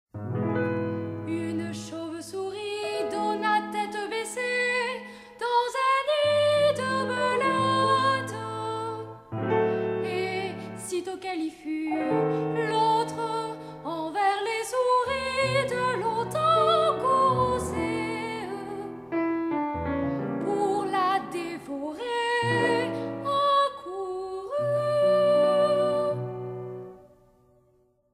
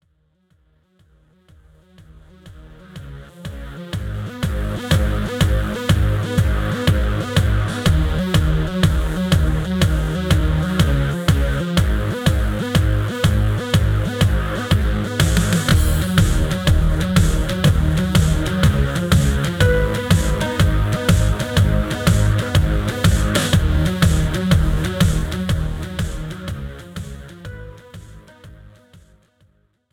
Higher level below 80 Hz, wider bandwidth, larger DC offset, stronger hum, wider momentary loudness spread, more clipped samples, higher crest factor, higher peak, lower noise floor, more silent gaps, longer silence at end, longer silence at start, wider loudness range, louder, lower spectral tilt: second, -60 dBFS vs -24 dBFS; second, 15 kHz vs 18 kHz; neither; neither; about the same, 12 LU vs 12 LU; neither; about the same, 16 dB vs 16 dB; second, -12 dBFS vs -2 dBFS; about the same, -65 dBFS vs -62 dBFS; neither; second, 1.1 s vs 1.25 s; second, 0.15 s vs 2.45 s; second, 5 LU vs 11 LU; second, -27 LUFS vs -18 LUFS; about the same, -5 dB/octave vs -5.5 dB/octave